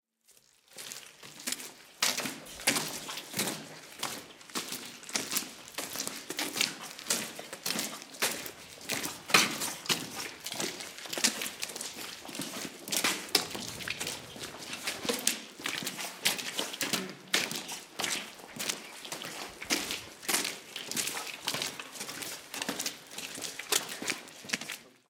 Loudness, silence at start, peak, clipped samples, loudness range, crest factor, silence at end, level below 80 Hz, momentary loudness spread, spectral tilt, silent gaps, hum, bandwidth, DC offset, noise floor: -33 LUFS; 0.3 s; -6 dBFS; under 0.1%; 4 LU; 30 dB; 0.15 s; -74 dBFS; 11 LU; -0.5 dB/octave; none; none; 18 kHz; under 0.1%; -65 dBFS